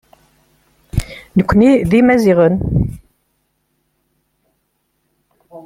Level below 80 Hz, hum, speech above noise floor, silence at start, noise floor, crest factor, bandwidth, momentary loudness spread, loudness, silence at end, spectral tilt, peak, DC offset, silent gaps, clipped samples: -34 dBFS; none; 55 dB; 0.95 s; -67 dBFS; 14 dB; 15.5 kHz; 13 LU; -13 LUFS; 0.05 s; -8 dB/octave; -2 dBFS; under 0.1%; none; under 0.1%